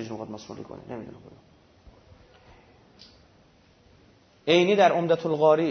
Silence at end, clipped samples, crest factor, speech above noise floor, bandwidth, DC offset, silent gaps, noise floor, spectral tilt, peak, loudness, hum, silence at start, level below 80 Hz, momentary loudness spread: 0 s; under 0.1%; 20 dB; 35 dB; 6.6 kHz; under 0.1%; none; -58 dBFS; -5.5 dB/octave; -8 dBFS; -22 LUFS; none; 0 s; -62 dBFS; 21 LU